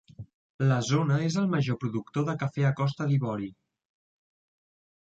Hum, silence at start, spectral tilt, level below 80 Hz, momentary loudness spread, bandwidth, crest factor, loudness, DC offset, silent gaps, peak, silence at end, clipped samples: none; 0.2 s; -6.5 dB/octave; -64 dBFS; 6 LU; 7.8 kHz; 16 dB; -28 LUFS; under 0.1%; 0.34-0.59 s; -12 dBFS; 1.55 s; under 0.1%